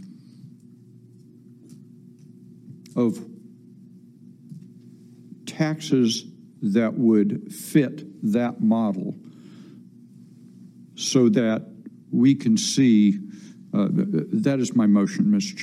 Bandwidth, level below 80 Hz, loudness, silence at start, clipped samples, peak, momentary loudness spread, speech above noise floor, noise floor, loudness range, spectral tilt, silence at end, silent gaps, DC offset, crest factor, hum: 14.5 kHz; -74 dBFS; -22 LUFS; 0 s; under 0.1%; -4 dBFS; 21 LU; 28 dB; -49 dBFS; 12 LU; -6 dB/octave; 0 s; none; under 0.1%; 20 dB; none